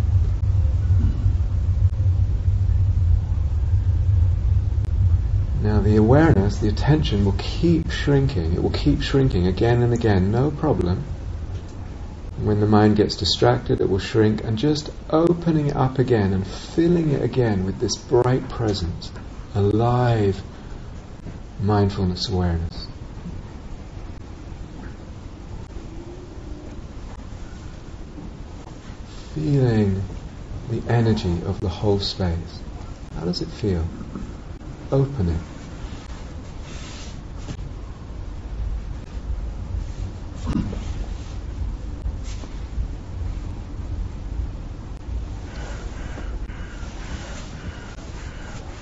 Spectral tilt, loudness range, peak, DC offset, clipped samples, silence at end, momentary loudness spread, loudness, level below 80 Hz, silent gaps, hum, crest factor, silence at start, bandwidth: -7 dB/octave; 15 LU; -2 dBFS; under 0.1%; under 0.1%; 0 s; 18 LU; -22 LUFS; -30 dBFS; none; none; 20 dB; 0 s; 8 kHz